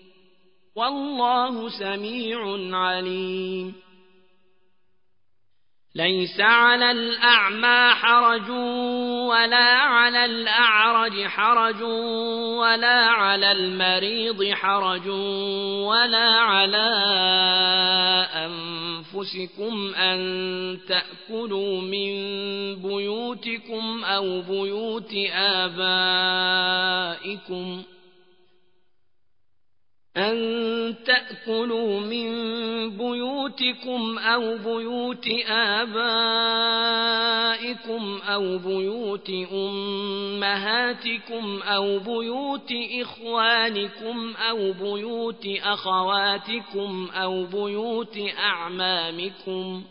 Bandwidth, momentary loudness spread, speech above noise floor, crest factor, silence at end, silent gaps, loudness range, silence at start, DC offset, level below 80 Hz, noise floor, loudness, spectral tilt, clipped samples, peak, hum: 5.4 kHz; 13 LU; 57 dB; 20 dB; 0.05 s; none; 9 LU; 0.75 s; 0.1%; -78 dBFS; -81 dBFS; -22 LUFS; -8 dB/octave; under 0.1%; -4 dBFS; none